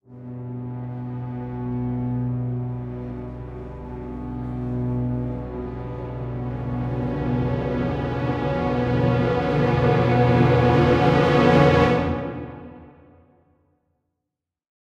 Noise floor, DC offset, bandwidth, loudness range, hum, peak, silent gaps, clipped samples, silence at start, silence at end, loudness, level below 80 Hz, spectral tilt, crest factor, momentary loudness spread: -84 dBFS; under 0.1%; 7.4 kHz; 11 LU; none; -4 dBFS; none; under 0.1%; 0.1 s; 1.95 s; -22 LUFS; -38 dBFS; -8.5 dB/octave; 18 dB; 17 LU